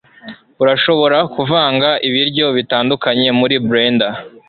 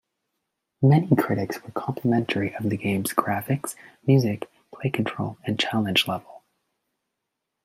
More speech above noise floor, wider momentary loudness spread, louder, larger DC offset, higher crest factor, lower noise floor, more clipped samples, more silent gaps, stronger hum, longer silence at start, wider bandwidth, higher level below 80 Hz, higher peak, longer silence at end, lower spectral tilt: second, 22 dB vs 58 dB; second, 3 LU vs 11 LU; first, -13 LUFS vs -24 LUFS; neither; second, 14 dB vs 22 dB; second, -36 dBFS vs -82 dBFS; neither; neither; neither; second, 0.25 s vs 0.8 s; second, 4.8 kHz vs 16 kHz; first, -56 dBFS vs -64 dBFS; about the same, 0 dBFS vs -2 dBFS; second, 0.2 s vs 1.25 s; first, -9.5 dB/octave vs -6 dB/octave